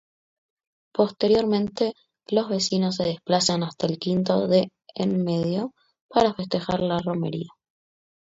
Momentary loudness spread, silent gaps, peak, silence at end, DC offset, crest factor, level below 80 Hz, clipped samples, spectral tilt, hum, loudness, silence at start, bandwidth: 8 LU; 6.01-6.09 s; -4 dBFS; 0.85 s; under 0.1%; 20 dB; -58 dBFS; under 0.1%; -5.5 dB/octave; none; -24 LUFS; 0.95 s; 8 kHz